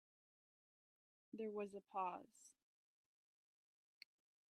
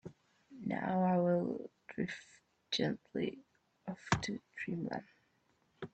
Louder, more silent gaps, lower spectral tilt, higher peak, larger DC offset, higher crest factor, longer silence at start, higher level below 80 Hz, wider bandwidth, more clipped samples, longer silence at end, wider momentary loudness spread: second, -50 LUFS vs -37 LUFS; neither; about the same, -5.5 dB/octave vs -6 dB/octave; second, -34 dBFS vs -14 dBFS; neither; second, 20 dB vs 26 dB; first, 1.35 s vs 0.05 s; second, under -90 dBFS vs -68 dBFS; first, 13 kHz vs 8.6 kHz; neither; first, 2 s vs 0.05 s; first, 20 LU vs 17 LU